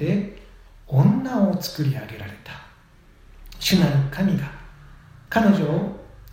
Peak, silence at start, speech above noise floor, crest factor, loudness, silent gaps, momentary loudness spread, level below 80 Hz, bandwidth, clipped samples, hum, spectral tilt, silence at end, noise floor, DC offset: -4 dBFS; 0 s; 31 dB; 20 dB; -21 LUFS; none; 20 LU; -46 dBFS; 16 kHz; under 0.1%; none; -6.5 dB/octave; 0 s; -51 dBFS; under 0.1%